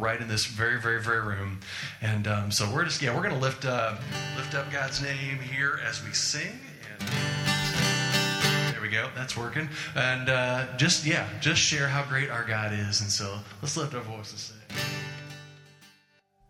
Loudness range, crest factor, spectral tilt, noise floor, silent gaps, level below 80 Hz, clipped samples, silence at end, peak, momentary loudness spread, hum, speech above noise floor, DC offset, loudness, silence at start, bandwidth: 5 LU; 20 dB; -3.5 dB/octave; -65 dBFS; none; -58 dBFS; under 0.1%; 0.6 s; -8 dBFS; 12 LU; none; 36 dB; under 0.1%; -27 LUFS; 0 s; 16.5 kHz